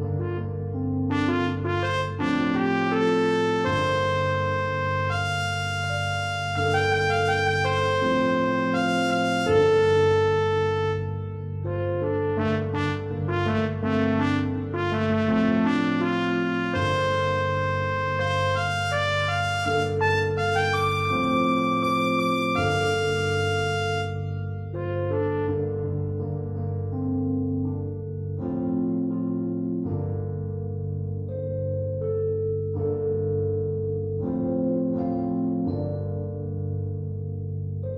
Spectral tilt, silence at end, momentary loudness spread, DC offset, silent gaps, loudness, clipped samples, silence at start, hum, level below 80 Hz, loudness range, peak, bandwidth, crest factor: -6.5 dB/octave; 0 s; 8 LU; under 0.1%; none; -25 LUFS; under 0.1%; 0 s; none; -52 dBFS; 6 LU; -10 dBFS; 12 kHz; 16 dB